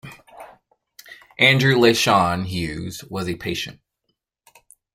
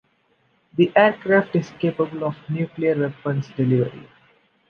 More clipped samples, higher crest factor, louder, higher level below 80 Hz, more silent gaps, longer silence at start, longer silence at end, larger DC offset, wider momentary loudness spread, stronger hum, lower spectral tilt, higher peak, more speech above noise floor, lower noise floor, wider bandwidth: neither; about the same, 20 dB vs 20 dB; about the same, -19 LUFS vs -21 LUFS; first, -52 dBFS vs -62 dBFS; neither; second, 0.05 s vs 0.75 s; first, 1.2 s vs 0.7 s; neither; first, 16 LU vs 11 LU; neither; second, -4.5 dB/octave vs -8.5 dB/octave; about the same, -2 dBFS vs -2 dBFS; first, 56 dB vs 44 dB; first, -75 dBFS vs -64 dBFS; first, 16.5 kHz vs 6.6 kHz